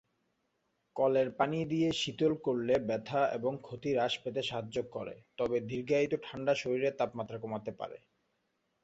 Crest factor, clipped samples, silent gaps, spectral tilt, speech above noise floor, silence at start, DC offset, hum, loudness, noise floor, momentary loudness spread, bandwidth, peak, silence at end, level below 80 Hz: 20 dB; under 0.1%; none; -5.5 dB/octave; 47 dB; 0.95 s; under 0.1%; none; -33 LUFS; -79 dBFS; 10 LU; 8.2 kHz; -14 dBFS; 0.85 s; -68 dBFS